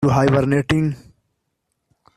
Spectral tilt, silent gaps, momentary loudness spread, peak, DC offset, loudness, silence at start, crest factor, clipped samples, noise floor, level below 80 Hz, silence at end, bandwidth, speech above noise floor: -7.5 dB/octave; none; 10 LU; -2 dBFS; under 0.1%; -18 LUFS; 0 s; 18 dB; under 0.1%; -74 dBFS; -46 dBFS; 1.2 s; 12.5 kHz; 57 dB